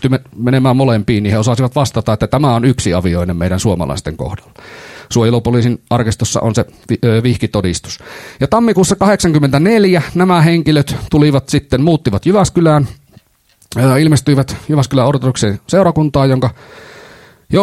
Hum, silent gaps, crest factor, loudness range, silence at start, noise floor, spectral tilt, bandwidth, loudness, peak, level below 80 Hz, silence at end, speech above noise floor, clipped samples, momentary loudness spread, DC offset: none; none; 12 dB; 4 LU; 0 s; -52 dBFS; -6.5 dB/octave; 14.5 kHz; -13 LUFS; 0 dBFS; -36 dBFS; 0 s; 40 dB; under 0.1%; 9 LU; under 0.1%